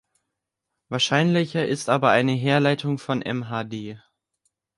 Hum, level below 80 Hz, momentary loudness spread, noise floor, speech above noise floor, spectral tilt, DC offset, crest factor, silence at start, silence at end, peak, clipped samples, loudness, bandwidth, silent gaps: none; -66 dBFS; 12 LU; -82 dBFS; 60 dB; -5.5 dB/octave; under 0.1%; 20 dB; 0.9 s; 0.8 s; -4 dBFS; under 0.1%; -22 LUFS; 11.5 kHz; none